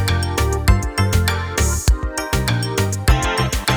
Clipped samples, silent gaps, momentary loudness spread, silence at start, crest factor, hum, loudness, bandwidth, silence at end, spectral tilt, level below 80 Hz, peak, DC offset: under 0.1%; none; 3 LU; 0 s; 16 dB; none; -19 LUFS; over 20 kHz; 0 s; -4.5 dB/octave; -22 dBFS; 0 dBFS; under 0.1%